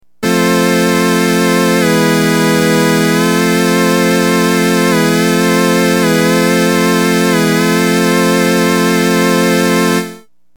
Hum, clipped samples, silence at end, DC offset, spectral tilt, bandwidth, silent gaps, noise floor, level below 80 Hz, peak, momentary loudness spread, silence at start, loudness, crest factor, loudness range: none; under 0.1%; 0.4 s; 0.5%; -4.5 dB/octave; 19.5 kHz; none; -33 dBFS; -50 dBFS; -2 dBFS; 1 LU; 0.2 s; -11 LUFS; 10 dB; 0 LU